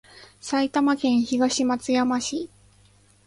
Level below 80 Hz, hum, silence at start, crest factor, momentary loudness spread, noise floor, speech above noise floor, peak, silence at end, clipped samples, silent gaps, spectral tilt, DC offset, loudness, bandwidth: -62 dBFS; 50 Hz at -55 dBFS; 0.15 s; 16 dB; 10 LU; -57 dBFS; 35 dB; -8 dBFS; 0.8 s; under 0.1%; none; -3 dB/octave; under 0.1%; -23 LUFS; 11.5 kHz